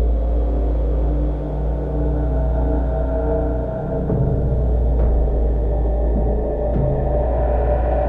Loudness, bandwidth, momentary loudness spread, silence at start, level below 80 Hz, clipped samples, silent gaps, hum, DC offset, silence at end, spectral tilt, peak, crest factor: -21 LUFS; 2.6 kHz; 4 LU; 0 s; -20 dBFS; under 0.1%; none; none; under 0.1%; 0 s; -11.5 dB/octave; -6 dBFS; 10 dB